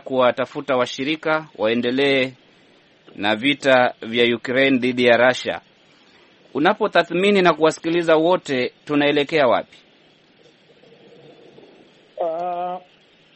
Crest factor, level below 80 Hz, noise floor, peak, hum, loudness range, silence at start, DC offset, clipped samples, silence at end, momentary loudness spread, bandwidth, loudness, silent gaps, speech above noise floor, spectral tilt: 20 dB; -64 dBFS; -54 dBFS; 0 dBFS; none; 8 LU; 0.05 s; under 0.1%; under 0.1%; 0.55 s; 10 LU; 8.8 kHz; -19 LUFS; none; 36 dB; -5 dB/octave